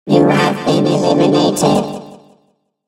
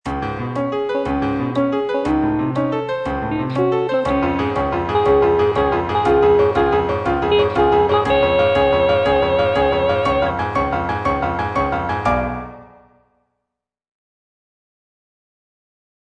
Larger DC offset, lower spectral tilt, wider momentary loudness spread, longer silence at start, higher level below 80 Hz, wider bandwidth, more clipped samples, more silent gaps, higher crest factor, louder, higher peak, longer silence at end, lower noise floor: neither; second, -5.5 dB/octave vs -7.5 dB/octave; about the same, 7 LU vs 7 LU; about the same, 0.05 s vs 0.05 s; second, -52 dBFS vs -36 dBFS; first, 16 kHz vs 9 kHz; neither; neither; about the same, 14 dB vs 14 dB; first, -13 LUFS vs -18 LUFS; first, 0 dBFS vs -4 dBFS; second, 0.7 s vs 3.4 s; second, -60 dBFS vs -80 dBFS